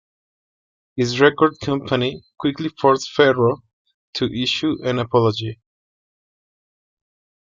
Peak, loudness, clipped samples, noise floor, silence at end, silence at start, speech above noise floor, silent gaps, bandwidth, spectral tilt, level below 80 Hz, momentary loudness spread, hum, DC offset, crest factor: -2 dBFS; -19 LUFS; under 0.1%; under -90 dBFS; 1.9 s; 0.95 s; over 71 dB; 3.73-3.85 s, 3.94-4.13 s; 7.6 kHz; -5.5 dB/octave; -56 dBFS; 11 LU; none; under 0.1%; 20 dB